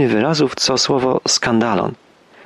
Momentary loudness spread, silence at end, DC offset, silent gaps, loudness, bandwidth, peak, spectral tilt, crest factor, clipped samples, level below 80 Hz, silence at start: 4 LU; 0.5 s; under 0.1%; none; -16 LUFS; 12.5 kHz; -4 dBFS; -3.5 dB/octave; 14 dB; under 0.1%; -52 dBFS; 0 s